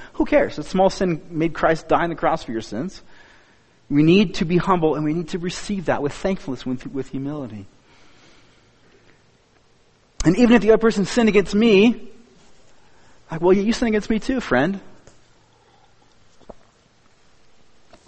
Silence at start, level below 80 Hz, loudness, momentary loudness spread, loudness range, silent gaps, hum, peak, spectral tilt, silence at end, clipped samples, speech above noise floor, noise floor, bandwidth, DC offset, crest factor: 0 s; -42 dBFS; -20 LUFS; 14 LU; 12 LU; none; none; -2 dBFS; -6 dB/octave; 1.5 s; under 0.1%; 38 dB; -57 dBFS; 8.8 kHz; under 0.1%; 20 dB